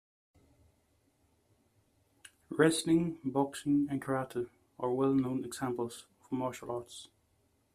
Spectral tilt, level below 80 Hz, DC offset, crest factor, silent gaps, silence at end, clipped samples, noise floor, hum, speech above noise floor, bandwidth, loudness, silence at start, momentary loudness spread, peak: -5.5 dB/octave; -70 dBFS; under 0.1%; 22 dB; none; 0.7 s; under 0.1%; -73 dBFS; none; 41 dB; 14.5 kHz; -33 LUFS; 2.5 s; 13 LU; -12 dBFS